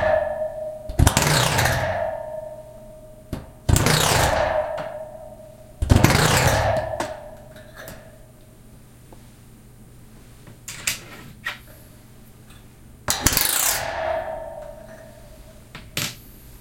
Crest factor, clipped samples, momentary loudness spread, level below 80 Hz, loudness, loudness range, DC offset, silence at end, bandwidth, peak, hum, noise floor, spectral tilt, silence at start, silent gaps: 24 dB; under 0.1%; 25 LU; -36 dBFS; -21 LUFS; 13 LU; under 0.1%; 0.05 s; 17 kHz; 0 dBFS; none; -46 dBFS; -3.5 dB/octave; 0 s; none